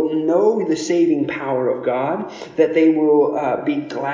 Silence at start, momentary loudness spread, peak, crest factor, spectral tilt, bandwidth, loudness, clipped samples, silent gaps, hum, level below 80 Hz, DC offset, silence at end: 0 s; 8 LU; -4 dBFS; 14 dB; -6 dB/octave; 7.6 kHz; -18 LUFS; under 0.1%; none; none; -64 dBFS; under 0.1%; 0 s